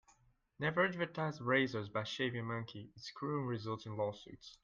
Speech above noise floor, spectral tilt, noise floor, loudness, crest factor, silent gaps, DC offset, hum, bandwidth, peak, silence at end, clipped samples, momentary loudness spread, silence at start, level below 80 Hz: 33 dB; -6 dB/octave; -71 dBFS; -38 LUFS; 20 dB; none; under 0.1%; none; 7.6 kHz; -18 dBFS; 0.1 s; under 0.1%; 16 LU; 0.6 s; -74 dBFS